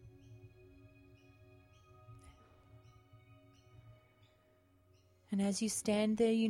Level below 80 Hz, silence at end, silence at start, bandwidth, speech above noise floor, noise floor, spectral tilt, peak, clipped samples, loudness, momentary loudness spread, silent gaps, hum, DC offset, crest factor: -70 dBFS; 0 s; 0.05 s; 16 kHz; 37 dB; -70 dBFS; -5 dB/octave; -22 dBFS; under 0.1%; -35 LUFS; 29 LU; none; none; under 0.1%; 18 dB